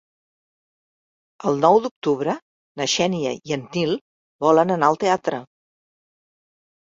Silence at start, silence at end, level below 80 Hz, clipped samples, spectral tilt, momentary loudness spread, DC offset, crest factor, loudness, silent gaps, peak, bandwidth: 1.45 s; 1.4 s; -64 dBFS; under 0.1%; -4.5 dB/octave; 11 LU; under 0.1%; 20 dB; -21 LUFS; 1.91-2.02 s, 2.42-2.75 s, 4.01-4.39 s; -2 dBFS; 7.8 kHz